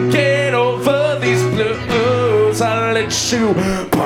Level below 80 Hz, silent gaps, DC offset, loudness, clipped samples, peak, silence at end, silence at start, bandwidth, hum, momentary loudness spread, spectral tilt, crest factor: -42 dBFS; none; under 0.1%; -15 LUFS; under 0.1%; 0 dBFS; 0 s; 0 s; 17 kHz; none; 3 LU; -4.5 dB/octave; 14 dB